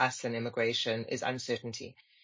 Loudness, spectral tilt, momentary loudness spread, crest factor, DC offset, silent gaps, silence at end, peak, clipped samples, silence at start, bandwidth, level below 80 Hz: -33 LUFS; -3.5 dB/octave; 12 LU; 22 dB; under 0.1%; none; 0.3 s; -12 dBFS; under 0.1%; 0 s; 7.6 kHz; -72 dBFS